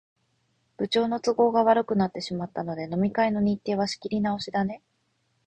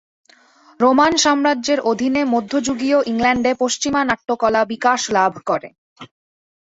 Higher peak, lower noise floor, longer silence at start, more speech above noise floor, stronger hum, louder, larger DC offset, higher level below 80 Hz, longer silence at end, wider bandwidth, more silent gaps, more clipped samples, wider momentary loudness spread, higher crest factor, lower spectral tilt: second, -8 dBFS vs -2 dBFS; first, -72 dBFS vs -51 dBFS; about the same, 0.8 s vs 0.8 s; first, 47 dB vs 34 dB; neither; second, -26 LUFS vs -17 LUFS; neither; second, -60 dBFS vs -52 dBFS; about the same, 0.7 s vs 0.7 s; about the same, 8.8 kHz vs 8 kHz; second, none vs 5.78-5.96 s; neither; first, 11 LU vs 6 LU; about the same, 18 dB vs 16 dB; first, -6 dB/octave vs -3 dB/octave